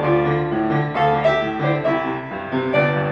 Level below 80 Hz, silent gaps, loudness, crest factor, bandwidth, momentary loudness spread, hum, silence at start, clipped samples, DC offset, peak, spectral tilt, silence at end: -48 dBFS; none; -20 LUFS; 14 dB; 7.2 kHz; 7 LU; none; 0 s; under 0.1%; 0.1%; -6 dBFS; -8.5 dB/octave; 0 s